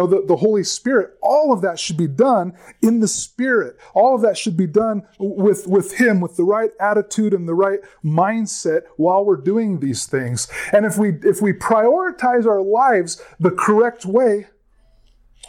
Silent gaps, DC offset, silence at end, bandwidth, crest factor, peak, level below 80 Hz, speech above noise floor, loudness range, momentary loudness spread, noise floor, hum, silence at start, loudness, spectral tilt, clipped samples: none; under 0.1%; 1.05 s; 16.5 kHz; 14 dB; -4 dBFS; -58 dBFS; 37 dB; 2 LU; 6 LU; -54 dBFS; none; 0 s; -17 LUFS; -5.5 dB/octave; under 0.1%